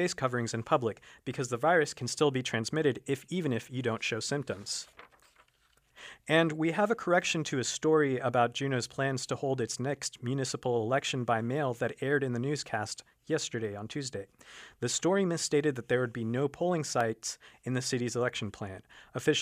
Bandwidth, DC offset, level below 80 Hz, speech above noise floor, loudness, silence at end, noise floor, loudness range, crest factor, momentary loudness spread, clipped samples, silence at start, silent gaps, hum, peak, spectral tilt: 15.5 kHz; under 0.1%; -70 dBFS; 38 dB; -31 LUFS; 0 s; -69 dBFS; 4 LU; 20 dB; 12 LU; under 0.1%; 0 s; none; none; -12 dBFS; -4.5 dB/octave